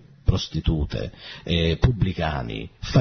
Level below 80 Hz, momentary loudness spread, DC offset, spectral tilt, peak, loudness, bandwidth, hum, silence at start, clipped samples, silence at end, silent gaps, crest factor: -32 dBFS; 11 LU; under 0.1%; -6.5 dB/octave; -4 dBFS; -25 LUFS; 6.6 kHz; none; 0.25 s; under 0.1%; 0 s; none; 20 dB